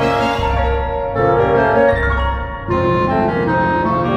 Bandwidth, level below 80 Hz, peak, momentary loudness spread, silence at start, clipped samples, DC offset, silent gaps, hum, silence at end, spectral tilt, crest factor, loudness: 9.4 kHz; -26 dBFS; 0 dBFS; 6 LU; 0 s; under 0.1%; under 0.1%; none; none; 0 s; -7.5 dB/octave; 14 dB; -16 LUFS